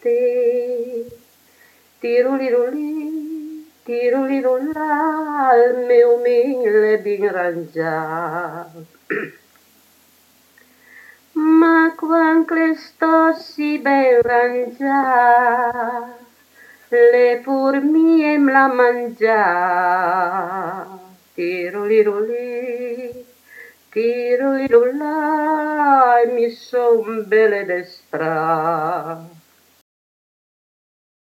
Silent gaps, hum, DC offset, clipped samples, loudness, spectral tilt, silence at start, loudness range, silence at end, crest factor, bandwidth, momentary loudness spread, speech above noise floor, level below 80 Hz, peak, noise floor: none; none; under 0.1%; under 0.1%; -17 LUFS; -6.5 dB/octave; 0.05 s; 7 LU; 2.05 s; 16 dB; 14 kHz; 14 LU; 38 dB; -68 dBFS; 0 dBFS; -54 dBFS